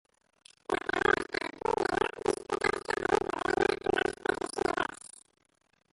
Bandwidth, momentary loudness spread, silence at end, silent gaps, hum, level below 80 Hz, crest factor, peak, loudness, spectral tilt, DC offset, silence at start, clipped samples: 11.5 kHz; 7 LU; 0.85 s; none; none; -58 dBFS; 20 dB; -12 dBFS; -31 LUFS; -4 dB/octave; under 0.1%; 0.7 s; under 0.1%